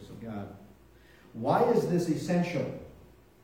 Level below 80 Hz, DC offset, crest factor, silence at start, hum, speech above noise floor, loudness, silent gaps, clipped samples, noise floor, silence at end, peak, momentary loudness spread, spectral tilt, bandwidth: -60 dBFS; under 0.1%; 20 dB; 0 s; none; 29 dB; -29 LUFS; none; under 0.1%; -57 dBFS; 0.4 s; -10 dBFS; 19 LU; -7 dB/octave; 16.5 kHz